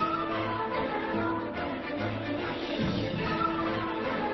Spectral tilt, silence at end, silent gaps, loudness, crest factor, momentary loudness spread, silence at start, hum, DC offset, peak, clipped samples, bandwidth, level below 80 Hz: -4 dB/octave; 0 s; none; -31 LUFS; 14 dB; 4 LU; 0 s; none; under 0.1%; -18 dBFS; under 0.1%; 6 kHz; -52 dBFS